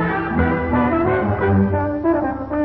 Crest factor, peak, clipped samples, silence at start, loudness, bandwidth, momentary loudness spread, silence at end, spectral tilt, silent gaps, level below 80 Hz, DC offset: 14 dB; -4 dBFS; under 0.1%; 0 s; -19 LUFS; 4.8 kHz; 3 LU; 0 s; -11.5 dB/octave; none; -38 dBFS; under 0.1%